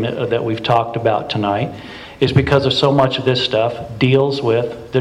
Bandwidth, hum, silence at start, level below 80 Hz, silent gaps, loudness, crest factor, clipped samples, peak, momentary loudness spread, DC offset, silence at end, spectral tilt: 10.5 kHz; none; 0 s; -42 dBFS; none; -17 LUFS; 14 dB; under 0.1%; -2 dBFS; 7 LU; under 0.1%; 0 s; -7 dB/octave